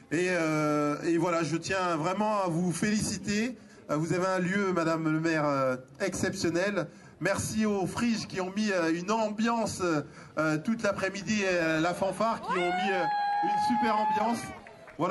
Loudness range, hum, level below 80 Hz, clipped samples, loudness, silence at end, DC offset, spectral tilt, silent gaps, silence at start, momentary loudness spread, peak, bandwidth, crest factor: 2 LU; none; -60 dBFS; under 0.1%; -29 LUFS; 0 s; under 0.1%; -5 dB/octave; none; 0.1 s; 6 LU; -14 dBFS; 12.5 kHz; 16 dB